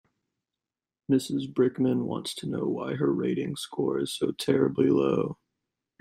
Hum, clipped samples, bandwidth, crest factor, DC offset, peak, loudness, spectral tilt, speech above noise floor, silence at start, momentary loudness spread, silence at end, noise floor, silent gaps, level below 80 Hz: none; under 0.1%; 16 kHz; 18 dB; under 0.1%; -10 dBFS; -27 LUFS; -6 dB/octave; 63 dB; 1.1 s; 9 LU; 0.65 s; -90 dBFS; none; -66 dBFS